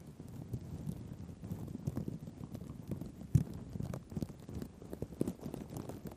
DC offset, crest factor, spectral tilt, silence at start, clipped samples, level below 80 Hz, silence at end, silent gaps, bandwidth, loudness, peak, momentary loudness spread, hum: under 0.1%; 26 dB; -8 dB/octave; 0 s; under 0.1%; -54 dBFS; 0 s; none; 15.5 kHz; -43 LUFS; -14 dBFS; 13 LU; none